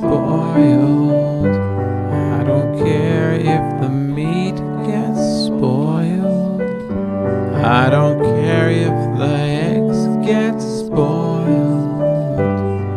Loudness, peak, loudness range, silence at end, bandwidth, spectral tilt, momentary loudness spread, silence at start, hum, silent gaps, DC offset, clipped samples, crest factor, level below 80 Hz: -16 LUFS; 0 dBFS; 3 LU; 0 s; 11 kHz; -8 dB/octave; 6 LU; 0 s; none; none; under 0.1%; under 0.1%; 14 dB; -44 dBFS